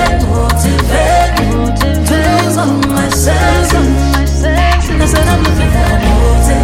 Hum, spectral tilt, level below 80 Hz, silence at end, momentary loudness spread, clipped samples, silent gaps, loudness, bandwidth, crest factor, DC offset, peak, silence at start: none; -5.5 dB/octave; -14 dBFS; 0 s; 2 LU; under 0.1%; none; -11 LUFS; 16.5 kHz; 10 dB; under 0.1%; 0 dBFS; 0 s